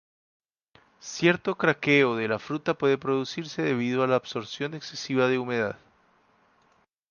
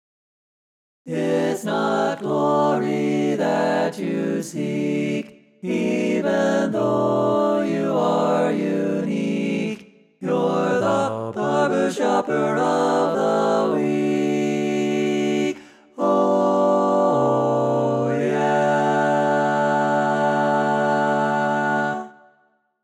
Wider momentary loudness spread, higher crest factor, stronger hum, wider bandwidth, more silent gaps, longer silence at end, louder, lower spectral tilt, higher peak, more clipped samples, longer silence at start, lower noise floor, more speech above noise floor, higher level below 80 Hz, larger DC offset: first, 12 LU vs 6 LU; first, 20 dB vs 14 dB; neither; second, 7.2 kHz vs 13.5 kHz; neither; first, 1.35 s vs 0.7 s; second, -26 LUFS vs -21 LUFS; about the same, -5.5 dB/octave vs -6 dB/octave; about the same, -6 dBFS vs -8 dBFS; neither; about the same, 1.05 s vs 1.05 s; about the same, -66 dBFS vs -63 dBFS; about the same, 41 dB vs 43 dB; about the same, -70 dBFS vs -68 dBFS; neither